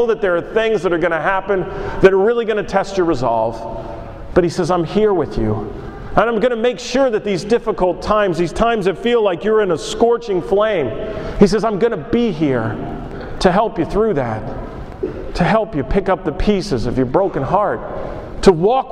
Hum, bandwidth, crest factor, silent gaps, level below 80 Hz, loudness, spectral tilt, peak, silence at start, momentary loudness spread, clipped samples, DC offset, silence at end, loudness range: none; 11 kHz; 16 dB; none; -32 dBFS; -17 LUFS; -6.5 dB/octave; 0 dBFS; 0 s; 12 LU; under 0.1%; under 0.1%; 0 s; 3 LU